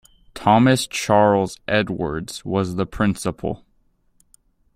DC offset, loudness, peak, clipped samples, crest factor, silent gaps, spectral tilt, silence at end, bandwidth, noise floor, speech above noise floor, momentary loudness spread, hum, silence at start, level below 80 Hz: under 0.1%; -20 LUFS; -2 dBFS; under 0.1%; 18 dB; none; -5.5 dB/octave; 1.2 s; 15.5 kHz; -62 dBFS; 43 dB; 12 LU; none; 0.35 s; -46 dBFS